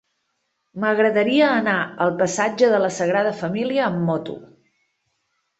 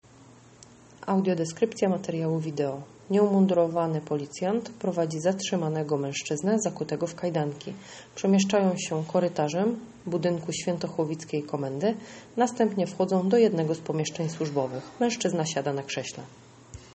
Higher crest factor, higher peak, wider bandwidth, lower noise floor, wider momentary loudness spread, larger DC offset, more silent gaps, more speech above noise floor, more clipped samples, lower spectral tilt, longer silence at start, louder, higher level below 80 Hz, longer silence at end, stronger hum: about the same, 16 dB vs 18 dB; first, -4 dBFS vs -10 dBFS; about the same, 8.2 kHz vs 8.4 kHz; first, -73 dBFS vs -53 dBFS; about the same, 8 LU vs 10 LU; neither; neither; first, 54 dB vs 26 dB; neither; about the same, -5 dB/octave vs -5.5 dB/octave; second, 0.75 s vs 1 s; first, -20 LUFS vs -27 LUFS; about the same, -64 dBFS vs -66 dBFS; first, 1.15 s vs 0 s; neither